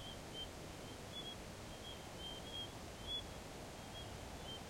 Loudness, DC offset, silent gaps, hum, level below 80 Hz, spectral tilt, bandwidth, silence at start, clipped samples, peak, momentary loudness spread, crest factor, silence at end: -49 LUFS; under 0.1%; none; none; -60 dBFS; -3.5 dB/octave; 16.5 kHz; 0 s; under 0.1%; -34 dBFS; 6 LU; 14 dB; 0 s